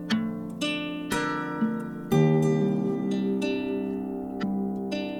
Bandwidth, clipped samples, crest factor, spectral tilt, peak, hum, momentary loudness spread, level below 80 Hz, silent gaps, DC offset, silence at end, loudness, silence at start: 15.5 kHz; under 0.1%; 18 dB; -6.5 dB/octave; -10 dBFS; none; 9 LU; -58 dBFS; none; under 0.1%; 0 s; -27 LUFS; 0 s